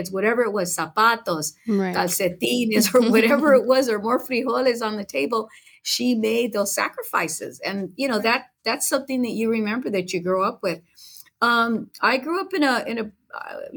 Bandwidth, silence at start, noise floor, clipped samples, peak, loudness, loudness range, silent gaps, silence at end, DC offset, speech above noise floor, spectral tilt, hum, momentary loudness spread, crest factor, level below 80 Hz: over 20 kHz; 0 s; -43 dBFS; under 0.1%; -6 dBFS; -22 LUFS; 5 LU; none; 0 s; under 0.1%; 22 dB; -3.5 dB/octave; none; 11 LU; 16 dB; -70 dBFS